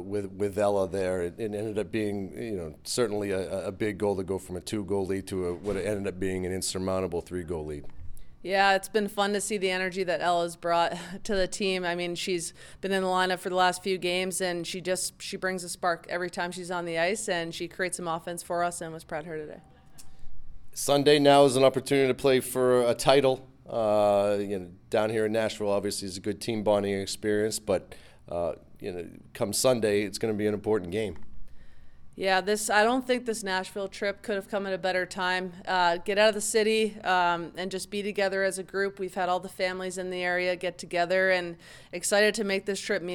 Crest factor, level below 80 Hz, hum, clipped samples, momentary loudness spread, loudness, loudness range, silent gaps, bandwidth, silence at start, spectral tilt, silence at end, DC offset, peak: 24 dB; -54 dBFS; none; under 0.1%; 11 LU; -28 LUFS; 7 LU; none; 19 kHz; 0 s; -4 dB/octave; 0 s; under 0.1%; -4 dBFS